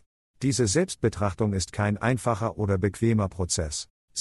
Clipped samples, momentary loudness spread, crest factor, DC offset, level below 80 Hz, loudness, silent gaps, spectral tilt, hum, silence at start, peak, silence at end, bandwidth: under 0.1%; 5 LU; 16 dB; under 0.1%; -48 dBFS; -26 LUFS; 3.90-4.08 s; -5 dB/octave; none; 0.4 s; -10 dBFS; 0 s; 12 kHz